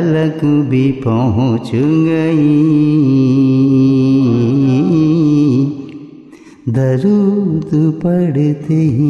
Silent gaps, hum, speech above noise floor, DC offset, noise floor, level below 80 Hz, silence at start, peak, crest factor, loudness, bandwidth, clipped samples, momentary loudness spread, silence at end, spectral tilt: none; none; 26 dB; under 0.1%; -38 dBFS; -50 dBFS; 0 s; -2 dBFS; 10 dB; -12 LUFS; 7 kHz; under 0.1%; 5 LU; 0 s; -9.5 dB/octave